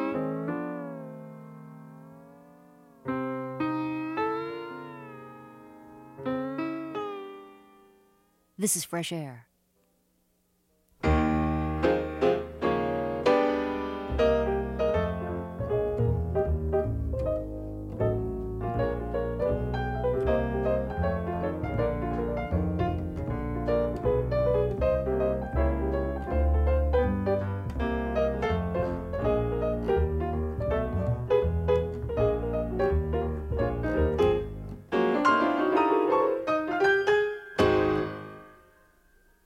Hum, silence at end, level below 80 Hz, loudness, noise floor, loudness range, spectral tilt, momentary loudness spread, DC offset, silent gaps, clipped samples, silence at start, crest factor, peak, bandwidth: none; 0.95 s; -36 dBFS; -28 LUFS; -70 dBFS; 9 LU; -6.5 dB/octave; 13 LU; under 0.1%; none; under 0.1%; 0 s; 18 dB; -10 dBFS; 15 kHz